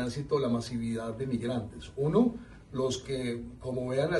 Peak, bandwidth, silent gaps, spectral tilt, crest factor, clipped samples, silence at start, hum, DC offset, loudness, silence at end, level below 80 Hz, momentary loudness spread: -14 dBFS; 11.5 kHz; none; -6.5 dB/octave; 18 dB; under 0.1%; 0 s; none; under 0.1%; -32 LUFS; 0 s; -54 dBFS; 10 LU